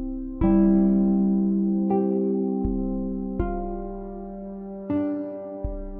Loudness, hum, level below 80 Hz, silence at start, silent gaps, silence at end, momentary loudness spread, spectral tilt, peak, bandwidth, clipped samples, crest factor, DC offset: -24 LUFS; none; -36 dBFS; 0 s; none; 0 s; 16 LU; -14 dB/octave; -8 dBFS; 2.8 kHz; under 0.1%; 14 dB; under 0.1%